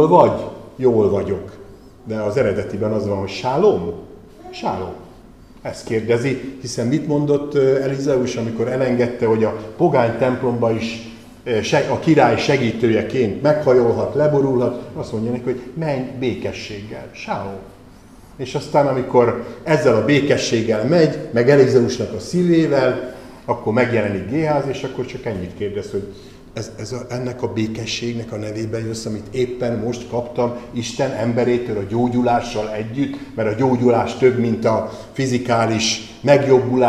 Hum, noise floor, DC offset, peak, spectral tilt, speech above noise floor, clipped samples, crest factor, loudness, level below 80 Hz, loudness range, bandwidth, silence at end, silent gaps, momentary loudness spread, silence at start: none; -43 dBFS; 0.2%; 0 dBFS; -6 dB/octave; 25 dB; under 0.1%; 18 dB; -19 LUFS; -48 dBFS; 8 LU; 12.5 kHz; 0 s; none; 13 LU; 0 s